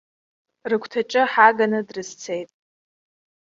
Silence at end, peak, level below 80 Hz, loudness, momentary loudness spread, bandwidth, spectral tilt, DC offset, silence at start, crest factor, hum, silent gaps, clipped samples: 1 s; -2 dBFS; -72 dBFS; -20 LUFS; 17 LU; 7.8 kHz; -4 dB/octave; under 0.1%; 0.65 s; 22 dB; none; none; under 0.1%